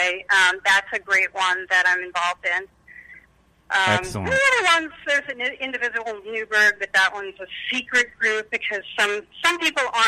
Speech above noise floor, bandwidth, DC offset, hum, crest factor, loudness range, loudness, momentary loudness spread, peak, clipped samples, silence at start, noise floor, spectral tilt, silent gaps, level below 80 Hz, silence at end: 36 dB; 15.5 kHz; under 0.1%; none; 14 dB; 2 LU; -20 LUFS; 9 LU; -8 dBFS; under 0.1%; 0 s; -58 dBFS; -2 dB/octave; none; -56 dBFS; 0 s